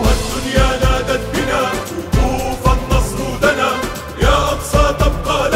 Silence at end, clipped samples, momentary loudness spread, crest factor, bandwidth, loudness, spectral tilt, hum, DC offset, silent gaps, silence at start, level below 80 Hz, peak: 0 s; under 0.1%; 5 LU; 14 dB; 16.5 kHz; -16 LUFS; -5 dB/octave; none; under 0.1%; none; 0 s; -20 dBFS; 0 dBFS